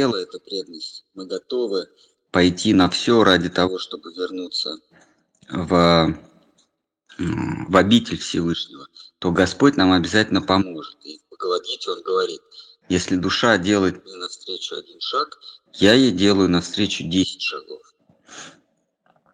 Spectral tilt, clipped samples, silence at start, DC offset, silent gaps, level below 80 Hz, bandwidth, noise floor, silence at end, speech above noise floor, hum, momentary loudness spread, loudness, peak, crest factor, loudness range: -5 dB/octave; under 0.1%; 0 s; under 0.1%; none; -50 dBFS; 10 kHz; -67 dBFS; 0.85 s; 47 dB; none; 19 LU; -20 LUFS; 0 dBFS; 20 dB; 3 LU